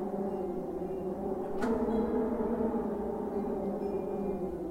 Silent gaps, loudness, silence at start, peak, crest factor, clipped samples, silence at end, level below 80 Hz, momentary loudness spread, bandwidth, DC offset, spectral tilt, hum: none; -34 LUFS; 0 s; -20 dBFS; 14 dB; under 0.1%; 0 s; -52 dBFS; 6 LU; 16 kHz; under 0.1%; -8.5 dB/octave; none